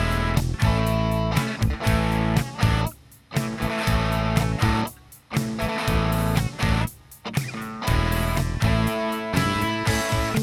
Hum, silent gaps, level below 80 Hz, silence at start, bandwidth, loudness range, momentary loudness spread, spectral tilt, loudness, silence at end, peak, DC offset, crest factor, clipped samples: none; none; -30 dBFS; 0 s; 17 kHz; 2 LU; 6 LU; -5.5 dB/octave; -24 LUFS; 0 s; -8 dBFS; under 0.1%; 16 dB; under 0.1%